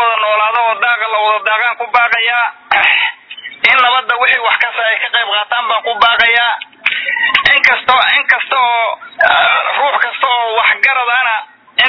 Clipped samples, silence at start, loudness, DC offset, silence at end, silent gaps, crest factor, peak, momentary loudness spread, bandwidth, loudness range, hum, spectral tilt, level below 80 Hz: 0.3%; 0 s; -11 LUFS; under 0.1%; 0 s; none; 12 dB; 0 dBFS; 7 LU; 5.4 kHz; 1 LU; none; -1.5 dB/octave; -54 dBFS